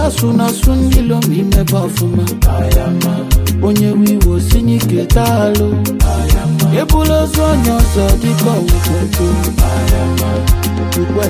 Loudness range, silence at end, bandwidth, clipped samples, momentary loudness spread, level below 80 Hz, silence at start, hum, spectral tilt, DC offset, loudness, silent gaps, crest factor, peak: 1 LU; 0 s; 16 kHz; under 0.1%; 3 LU; -16 dBFS; 0 s; none; -6 dB/octave; under 0.1%; -13 LUFS; none; 10 dB; 0 dBFS